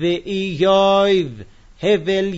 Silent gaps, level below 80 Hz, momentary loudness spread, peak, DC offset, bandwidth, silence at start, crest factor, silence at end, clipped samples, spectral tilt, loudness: none; -48 dBFS; 10 LU; -4 dBFS; under 0.1%; 8 kHz; 0 s; 14 dB; 0 s; under 0.1%; -6 dB/octave; -17 LUFS